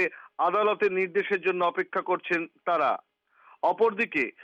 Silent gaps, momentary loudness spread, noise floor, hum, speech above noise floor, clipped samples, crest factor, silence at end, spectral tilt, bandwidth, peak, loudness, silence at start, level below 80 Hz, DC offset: none; 5 LU; -59 dBFS; none; 32 dB; under 0.1%; 14 dB; 0 s; -6 dB/octave; 7.6 kHz; -14 dBFS; -27 LUFS; 0 s; -74 dBFS; under 0.1%